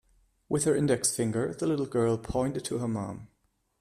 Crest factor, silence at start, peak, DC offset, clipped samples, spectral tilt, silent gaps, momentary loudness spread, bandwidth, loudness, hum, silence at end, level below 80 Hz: 18 dB; 0.5 s; -12 dBFS; under 0.1%; under 0.1%; -5 dB/octave; none; 8 LU; 15 kHz; -29 LUFS; none; 0.55 s; -54 dBFS